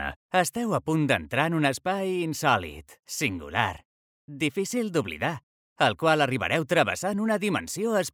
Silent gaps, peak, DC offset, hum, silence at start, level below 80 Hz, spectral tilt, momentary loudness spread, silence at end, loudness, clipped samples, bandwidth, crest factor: 0.16-0.29 s, 3.85-4.28 s, 5.43-5.76 s; -6 dBFS; under 0.1%; none; 0 s; -56 dBFS; -4.5 dB/octave; 7 LU; 0.05 s; -26 LUFS; under 0.1%; 18 kHz; 20 dB